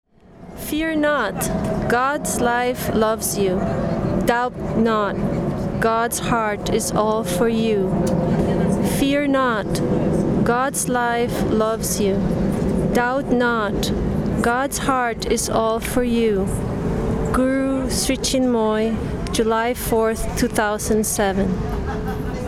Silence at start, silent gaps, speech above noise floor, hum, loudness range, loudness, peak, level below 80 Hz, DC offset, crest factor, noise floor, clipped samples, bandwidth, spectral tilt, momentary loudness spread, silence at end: 0.35 s; none; 22 dB; none; 1 LU; -20 LUFS; -2 dBFS; -34 dBFS; under 0.1%; 18 dB; -41 dBFS; under 0.1%; 16.5 kHz; -5 dB/octave; 4 LU; 0 s